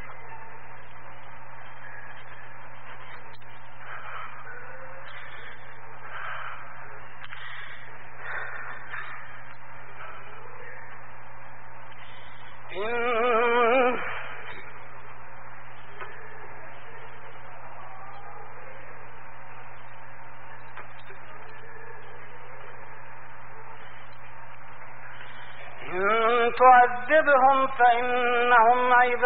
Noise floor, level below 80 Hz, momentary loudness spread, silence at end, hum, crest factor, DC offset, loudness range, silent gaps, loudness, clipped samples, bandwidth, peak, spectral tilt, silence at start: -47 dBFS; -62 dBFS; 25 LU; 0 s; none; 22 dB; 4%; 23 LU; none; -23 LUFS; under 0.1%; 4 kHz; -6 dBFS; -1.5 dB/octave; 0 s